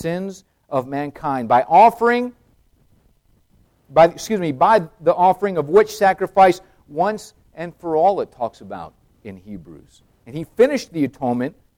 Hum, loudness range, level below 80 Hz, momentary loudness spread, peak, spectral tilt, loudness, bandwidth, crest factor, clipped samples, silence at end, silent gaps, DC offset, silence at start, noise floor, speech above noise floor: none; 8 LU; -54 dBFS; 20 LU; -2 dBFS; -6 dB/octave; -18 LUFS; 16.5 kHz; 16 dB; under 0.1%; 0.25 s; none; under 0.1%; 0 s; -58 dBFS; 40 dB